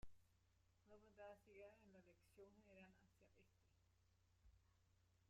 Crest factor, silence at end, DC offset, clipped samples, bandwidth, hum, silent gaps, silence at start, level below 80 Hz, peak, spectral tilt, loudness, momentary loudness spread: 20 dB; 0 s; under 0.1%; under 0.1%; 7.6 kHz; none; none; 0 s; -80 dBFS; -48 dBFS; -5 dB/octave; -66 LUFS; 5 LU